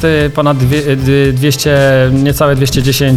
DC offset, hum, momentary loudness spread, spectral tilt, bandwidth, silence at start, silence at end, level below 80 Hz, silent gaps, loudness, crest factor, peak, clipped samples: under 0.1%; none; 3 LU; -5.5 dB/octave; 16 kHz; 0 s; 0 s; -28 dBFS; none; -10 LUFS; 10 dB; 0 dBFS; under 0.1%